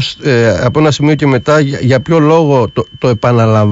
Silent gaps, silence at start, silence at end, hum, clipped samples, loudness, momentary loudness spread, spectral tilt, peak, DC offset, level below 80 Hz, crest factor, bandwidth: none; 0 s; 0 s; none; under 0.1%; -10 LUFS; 4 LU; -7 dB/octave; 0 dBFS; under 0.1%; -40 dBFS; 10 dB; 8 kHz